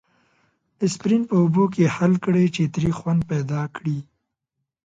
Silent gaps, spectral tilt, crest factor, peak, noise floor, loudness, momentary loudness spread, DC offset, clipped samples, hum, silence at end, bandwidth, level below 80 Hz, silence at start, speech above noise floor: none; -7.5 dB/octave; 16 dB; -6 dBFS; -80 dBFS; -21 LUFS; 8 LU; under 0.1%; under 0.1%; none; 0.85 s; 9 kHz; -54 dBFS; 0.8 s; 60 dB